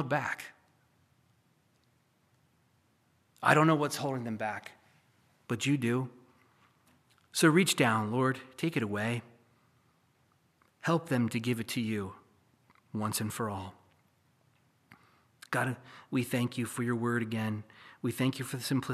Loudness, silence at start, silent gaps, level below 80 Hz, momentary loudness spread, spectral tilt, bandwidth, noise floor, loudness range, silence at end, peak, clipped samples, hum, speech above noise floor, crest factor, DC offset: -31 LUFS; 0 s; none; -78 dBFS; 15 LU; -5 dB/octave; 15 kHz; -71 dBFS; 8 LU; 0 s; -6 dBFS; under 0.1%; none; 40 dB; 26 dB; under 0.1%